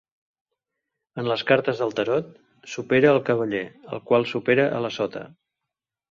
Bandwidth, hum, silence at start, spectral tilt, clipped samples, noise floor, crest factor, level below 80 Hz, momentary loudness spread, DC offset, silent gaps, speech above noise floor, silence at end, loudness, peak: 7.4 kHz; none; 1.15 s; -6 dB/octave; under 0.1%; -86 dBFS; 20 dB; -66 dBFS; 17 LU; under 0.1%; none; 63 dB; 0.85 s; -23 LUFS; -4 dBFS